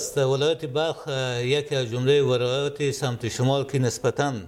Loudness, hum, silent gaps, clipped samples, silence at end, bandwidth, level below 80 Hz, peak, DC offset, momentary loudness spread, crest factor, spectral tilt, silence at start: -24 LUFS; none; none; under 0.1%; 0 s; 16 kHz; -58 dBFS; -10 dBFS; under 0.1%; 6 LU; 14 dB; -5 dB/octave; 0 s